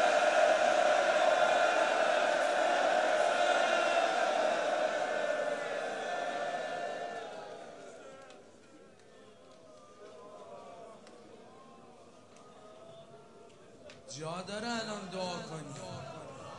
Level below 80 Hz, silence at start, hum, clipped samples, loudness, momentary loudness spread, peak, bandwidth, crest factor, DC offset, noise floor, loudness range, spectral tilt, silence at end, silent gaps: -80 dBFS; 0 s; none; under 0.1%; -31 LUFS; 23 LU; -16 dBFS; 11.5 kHz; 18 dB; under 0.1%; -58 dBFS; 25 LU; -2.5 dB/octave; 0 s; none